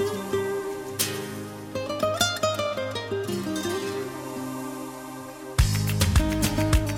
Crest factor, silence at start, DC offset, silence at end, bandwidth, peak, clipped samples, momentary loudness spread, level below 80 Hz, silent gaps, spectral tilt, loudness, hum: 20 dB; 0 s; under 0.1%; 0 s; 16.5 kHz; -8 dBFS; under 0.1%; 12 LU; -34 dBFS; none; -4.5 dB/octave; -27 LUFS; none